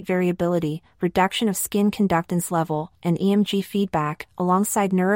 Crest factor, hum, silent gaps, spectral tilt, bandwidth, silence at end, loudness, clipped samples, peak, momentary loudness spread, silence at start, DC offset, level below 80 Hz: 16 dB; none; none; -5.5 dB/octave; 16.5 kHz; 0 s; -22 LUFS; under 0.1%; -6 dBFS; 6 LU; 0 s; under 0.1%; -54 dBFS